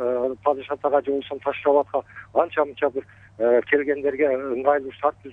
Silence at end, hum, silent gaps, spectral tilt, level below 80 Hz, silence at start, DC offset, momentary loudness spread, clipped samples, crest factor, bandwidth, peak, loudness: 0 s; none; none; -7.5 dB/octave; -62 dBFS; 0 s; under 0.1%; 6 LU; under 0.1%; 18 dB; 3.9 kHz; -6 dBFS; -23 LUFS